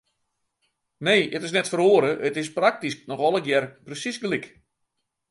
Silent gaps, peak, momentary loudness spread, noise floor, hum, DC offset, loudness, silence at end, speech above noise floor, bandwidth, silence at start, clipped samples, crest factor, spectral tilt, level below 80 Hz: none; -6 dBFS; 12 LU; -78 dBFS; none; under 0.1%; -23 LUFS; 0.85 s; 55 dB; 11.5 kHz; 1 s; under 0.1%; 20 dB; -4 dB/octave; -72 dBFS